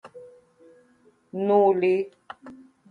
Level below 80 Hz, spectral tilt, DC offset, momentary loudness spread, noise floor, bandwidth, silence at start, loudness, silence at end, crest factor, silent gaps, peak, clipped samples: -74 dBFS; -8.5 dB/octave; under 0.1%; 24 LU; -61 dBFS; 4.9 kHz; 0.05 s; -22 LUFS; 0.35 s; 18 dB; none; -8 dBFS; under 0.1%